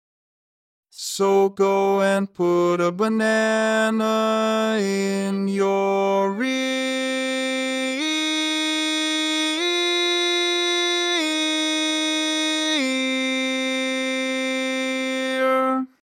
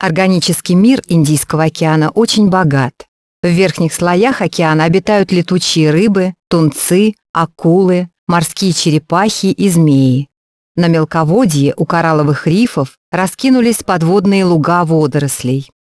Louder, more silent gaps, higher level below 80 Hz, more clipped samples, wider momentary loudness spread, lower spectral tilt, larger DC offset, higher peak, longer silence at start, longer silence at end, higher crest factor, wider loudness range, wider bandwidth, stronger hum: second, -21 LUFS vs -12 LUFS; second, none vs 3.08-3.43 s, 7.29-7.34 s, 8.19-8.27 s, 10.37-10.75 s, 12.97-13.12 s; second, -80 dBFS vs -48 dBFS; neither; about the same, 4 LU vs 5 LU; second, -3 dB/octave vs -5.5 dB/octave; neither; second, -8 dBFS vs 0 dBFS; first, 0.95 s vs 0 s; about the same, 0.2 s vs 0.2 s; about the same, 14 dB vs 12 dB; about the same, 2 LU vs 1 LU; first, 17 kHz vs 11 kHz; neither